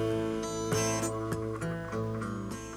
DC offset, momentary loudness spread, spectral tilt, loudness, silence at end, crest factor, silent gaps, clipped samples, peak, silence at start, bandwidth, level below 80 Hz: under 0.1%; 6 LU; -5 dB/octave; -33 LUFS; 0 s; 16 dB; none; under 0.1%; -16 dBFS; 0 s; 16 kHz; -52 dBFS